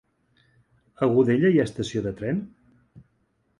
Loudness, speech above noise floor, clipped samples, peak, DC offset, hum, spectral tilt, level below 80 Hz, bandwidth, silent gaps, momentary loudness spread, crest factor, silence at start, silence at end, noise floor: -23 LUFS; 47 dB; under 0.1%; -8 dBFS; under 0.1%; none; -7.5 dB/octave; -56 dBFS; 11 kHz; none; 10 LU; 18 dB; 1 s; 0.6 s; -69 dBFS